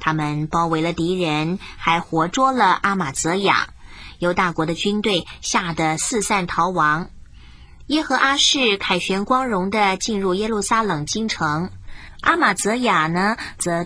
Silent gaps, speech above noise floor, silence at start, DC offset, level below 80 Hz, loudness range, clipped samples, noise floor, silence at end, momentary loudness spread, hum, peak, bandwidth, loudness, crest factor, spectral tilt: none; 23 dB; 0 s; under 0.1%; -44 dBFS; 2 LU; under 0.1%; -42 dBFS; 0 s; 6 LU; none; -2 dBFS; 10.5 kHz; -19 LUFS; 18 dB; -3.5 dB/octave